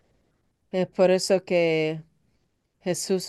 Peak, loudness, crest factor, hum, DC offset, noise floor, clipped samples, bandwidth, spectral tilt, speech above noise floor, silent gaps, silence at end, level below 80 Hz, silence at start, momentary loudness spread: -8 dBFS; -24 LUFS; 18 dB; none; under 0.1%; -71 dBFS; under 0.1%; 12.5 kHz; -4.5 dB/octave; 48 dB; none; 0 s; -70 dBFS; 0.75 s; 11 LU